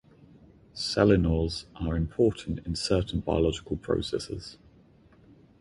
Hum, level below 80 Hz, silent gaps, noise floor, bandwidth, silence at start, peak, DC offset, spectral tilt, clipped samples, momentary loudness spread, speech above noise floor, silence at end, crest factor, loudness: none; -40 dBFS; none; -58 dBFS; 11.5 kHz; 0.75 s; -8 dBFS; under 0.1%; -6 dB/octave; under 0.1%; 13 LU; 30 dB; 1.05 s; 20 dB; -28 LUFS